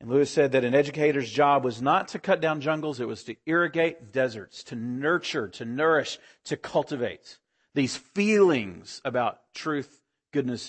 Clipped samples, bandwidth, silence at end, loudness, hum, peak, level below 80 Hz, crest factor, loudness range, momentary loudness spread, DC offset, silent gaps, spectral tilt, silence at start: under 0.1%; 8.8 kHz; 0 s; -26 LUFS; none; -8 dBFS; -70 dBFS; 18 dB; 4 LU; 13 LU; under 0.1%; none; -5.5 dB/octave; 0 s